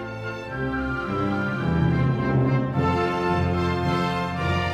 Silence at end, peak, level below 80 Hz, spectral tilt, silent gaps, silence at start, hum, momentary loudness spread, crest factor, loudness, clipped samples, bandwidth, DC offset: 0 s; -10 dBFS; -40 dBFS; -7.5 dB/octave; none; 0 s; none; 6 LU; 12 dB; -24 LUFS; under 0.1%; 9.4 kHz; under 0.1%